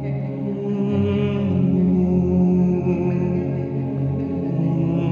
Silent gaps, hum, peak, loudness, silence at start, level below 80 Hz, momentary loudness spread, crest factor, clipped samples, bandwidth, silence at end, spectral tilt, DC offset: none; none; -8 dBFS; -21 LUFS; 0 s; -44 dBFS; 7 LU; 12 dB; under 0.1%; 4 kHz; 0 s; -10.5 dB/octave; under 0.1%